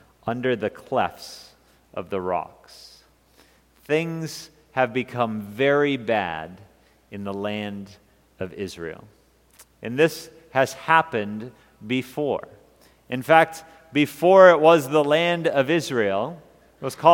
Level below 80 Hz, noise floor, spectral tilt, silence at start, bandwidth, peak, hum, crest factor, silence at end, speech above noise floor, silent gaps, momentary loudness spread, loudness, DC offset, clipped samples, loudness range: -62 dBFS; -57 dBFS; -5.5 dB/octave; 0.25 s; 17 kHz; 0 dBFS; none; 22 dB; 0 s; 35 dB; none; 19 LU; -22 LUFS; under 0.1%; under 0.1%; 13 LU